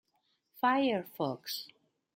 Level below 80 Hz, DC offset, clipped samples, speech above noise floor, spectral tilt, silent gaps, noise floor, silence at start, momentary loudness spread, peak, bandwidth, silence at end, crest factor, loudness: -82 dBFS; under 0.1%; under 0.1%; 45 dB; -4.5 dB/octave; none; -77 dBFS; 0.55 s; 12 LU; -16 dBFS; 16.5 kHz; 0.5 s; 20 dB; -33 LUFS